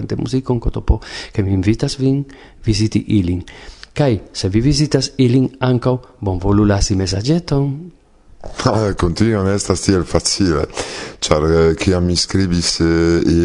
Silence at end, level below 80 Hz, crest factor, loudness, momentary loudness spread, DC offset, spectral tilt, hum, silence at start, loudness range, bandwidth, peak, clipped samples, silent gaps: 0 s; -30 dBFS; 16 dB; -17 LUFS; 9 LU; under 0.1%; -5.5 dB/octave; none; 0 s; 3 LU; 11 kHz; 0 dBFS; under 0.1%; none